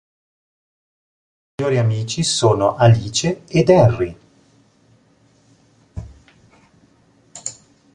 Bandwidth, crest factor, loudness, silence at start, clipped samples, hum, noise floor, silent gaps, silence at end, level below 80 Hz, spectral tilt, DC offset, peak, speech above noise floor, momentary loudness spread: 11 kHz; 18 dB; -16 LUFS; 1.6 s; under 0.1%; none; -56 dBFS; none; 0.45 s; -44 dBFS; -5.5 dB/octave; under 0.1%; -2 dBFS; 40 dB; 23 LU